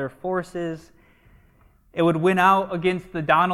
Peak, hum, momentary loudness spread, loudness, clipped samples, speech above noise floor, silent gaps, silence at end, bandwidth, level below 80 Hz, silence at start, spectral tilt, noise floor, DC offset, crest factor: -4 dBFS; none; 14 LU; -22 LUFS; under 0.1%; 35 dB; none; 0 s; 14 kHz; -56 dBFS; 0 s; -6.5 dB/octave; -56 dBFS; under 0.1%; 18 dB